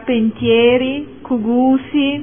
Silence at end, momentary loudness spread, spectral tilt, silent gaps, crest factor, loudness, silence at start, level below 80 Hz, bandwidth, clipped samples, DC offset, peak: 0 s; 10 LU; -10 dB/octave; none; 12 dB; -15 LUFS; 0 s; -46 dBFS; 3.6 kHz; under 0.1%; 0.5%; -2 dBFS